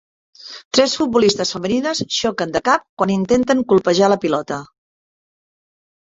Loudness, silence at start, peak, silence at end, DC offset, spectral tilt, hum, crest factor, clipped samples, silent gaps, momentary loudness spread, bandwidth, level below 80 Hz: -17 LUFS; 0.45 s; 0 dBFS; 1.45 s; under 0.1%; -4 dB/octave; none; 18 dB; under 0.1%; 0.65-0.71 s, 2.89-2.97 s; 7 LU; 8 kHz; -54 dBFS